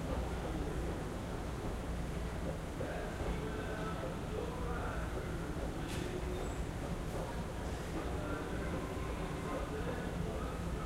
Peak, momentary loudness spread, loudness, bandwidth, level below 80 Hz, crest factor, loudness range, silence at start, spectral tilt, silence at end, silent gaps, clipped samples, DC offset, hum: -24 dBFS; 2 LU; -41 LUFS; 16 kHz; -44 dBFS; 14 dB; 1 LU; 0 s; -6 dB/octave; 0 s; none; under 0.1%; under 0.1%; none